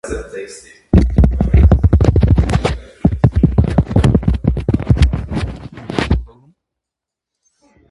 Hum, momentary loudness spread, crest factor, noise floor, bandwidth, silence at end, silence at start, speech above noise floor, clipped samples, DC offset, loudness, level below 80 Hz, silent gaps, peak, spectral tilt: none; 14 LU; 14 dB; -83 dBFS; 11.5 kHz; 1.65 s; 0.05 s; 68 dB; under 0.1%; under 0.1%; -15 LUFS; -18 dBFS; none; 0 dBFS; -8 dB/octave